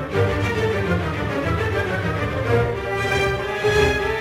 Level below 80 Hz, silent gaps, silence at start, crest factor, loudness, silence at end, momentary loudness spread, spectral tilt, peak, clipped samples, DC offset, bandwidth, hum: -34 dBFS; none; 0 s; 16 dB; -21 LUFS; 0 s; 5 LU; -6 dB/octave; -6 dBFS; under 0.1%; under 0.1%; 16 kHz; none